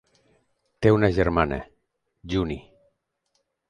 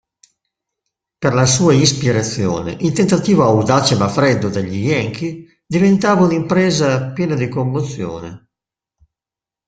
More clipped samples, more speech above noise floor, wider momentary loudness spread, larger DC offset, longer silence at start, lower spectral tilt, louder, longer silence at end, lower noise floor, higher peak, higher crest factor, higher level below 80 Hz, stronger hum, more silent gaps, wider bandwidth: neither; second, 52 dB vs 74 dB; about the same, 13 LU vs 11 LU; neither; second, 0.8 s vs 1.2 s; first, -8 dB/octave vs -5 dB/octave; second, -23 LUFS vs -15 LUFS; second, 1.1 s vs 1.3 s; second, -74 dBFS vs -89 dBFS; second, -4 dBFS vs 0 dBFS; first, 22 dB vs 16 dB; first, -42 dBFS vs -48 dBFS; neither; neither; about the same, 10 kHz vs 9.4 kHz